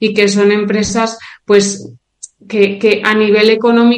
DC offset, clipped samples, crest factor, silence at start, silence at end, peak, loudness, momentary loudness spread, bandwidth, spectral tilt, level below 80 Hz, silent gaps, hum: under 0.1%; 0.2%; 12 dB; 0 s; 0 s; 0 dBFS; -12 LUFS; 9 LU; 9.8 kHz; -4.5 dB/octave; -50 dBFS; none; none